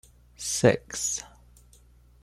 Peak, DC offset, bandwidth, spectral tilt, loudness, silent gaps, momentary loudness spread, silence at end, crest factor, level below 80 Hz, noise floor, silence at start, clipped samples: -6 dBFS; under 0.1%; 15 kHz; -4 dB/octave; -26 LUFS; none; 13 LU; 0.95 s; 24 dB; -54 dBFS; -56 dBFS; 0.4 s; under 0.1%